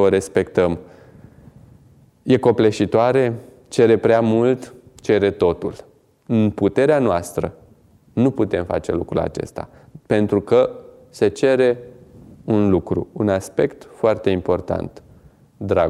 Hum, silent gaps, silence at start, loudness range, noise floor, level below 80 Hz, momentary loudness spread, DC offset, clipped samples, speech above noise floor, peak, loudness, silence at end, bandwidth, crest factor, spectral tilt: none; none; 0 s; 3 LU; -52 dBFS; -48 dBFS; 14 LU; under 0.1%; under 0.1%; 34 dB; -2 dBFS; -19 LUFS; 0 s; 13 kHz; 18 dB; -7 dB/octave